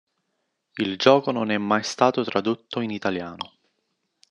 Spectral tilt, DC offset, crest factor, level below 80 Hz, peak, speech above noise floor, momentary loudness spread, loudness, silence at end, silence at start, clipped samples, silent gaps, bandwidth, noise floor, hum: -5 dB/octave; under 0.1%; 24 dB; -70 dBFS; 0 dBFS; 53 dB; 17 LU; -23 LUFS; 0.85 s; 0.75 s; under 0.1%; none; 10.5 kHz; -76 dBFS; none